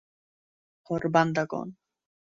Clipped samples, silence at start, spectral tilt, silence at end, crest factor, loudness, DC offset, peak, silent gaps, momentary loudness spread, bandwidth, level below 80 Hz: under 0.1%; 0.9 s; -6.5 dB/octave; 0.65 s; 22 dB; -27 LUFS; under 0.1%; -8 dBFS; none; 12 LU; 7.6 kHz; -64 dBFS